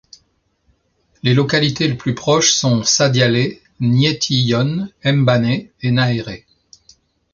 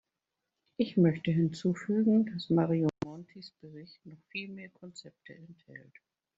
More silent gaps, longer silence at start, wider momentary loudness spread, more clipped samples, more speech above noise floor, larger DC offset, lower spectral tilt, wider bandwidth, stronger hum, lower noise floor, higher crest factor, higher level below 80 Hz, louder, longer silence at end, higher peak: neither; first, 1.25 s vs 0.8 s; second, 9 LU vs 25 LU; neither; second, 48 dB vs 56 dB; neither; second, -4.5 dB/octave vs -7.5 dB/octave; about the same, 7.4 kHz vs 7.8 kHz; neither; second, -63 dBFS vs -87 dBFS; about the same, 16 dB vs 18 dB; first, -50 dBFS vs -70 dBFS; first, -16 LUFS vs -30 LUFS; first, 0.95 s vs 0.6 s; first, -2 dBFS vs -14 dBFS